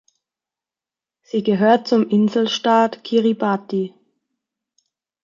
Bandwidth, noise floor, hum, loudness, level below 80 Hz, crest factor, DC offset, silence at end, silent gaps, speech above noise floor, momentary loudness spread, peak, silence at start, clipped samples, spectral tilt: 7.4 kHz; -90 dBFS; none; -18 LUFS; -70 dBFS; 18 dB; under 0.1%; 1.35 s; none; 72 dB; 9 LU; -4 dBFS; 1.35 s; under 0.1%; -6 dB/octave